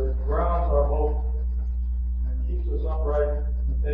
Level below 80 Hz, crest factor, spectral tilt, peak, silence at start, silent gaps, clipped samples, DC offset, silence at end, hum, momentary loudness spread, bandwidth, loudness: -24 dBFS; 14 dB; -9.5 dB/octave; -10 dBFS; 0 s; none; under 0.1%; under 0.1%; 0 s; 60 Hz at -25 dBFS; 6 LU; 2.3 kHz; -26 LUFS